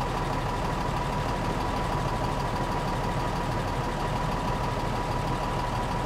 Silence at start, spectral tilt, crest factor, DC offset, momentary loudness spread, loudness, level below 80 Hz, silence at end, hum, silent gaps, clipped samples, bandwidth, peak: 0 s; -6 dB/octave; 12 dB; under 0.1%; 1 LU; -29 LUFS; -36 dBFS; 0 s; none; none; under 0.1%; 16 kHz; -16 dBFS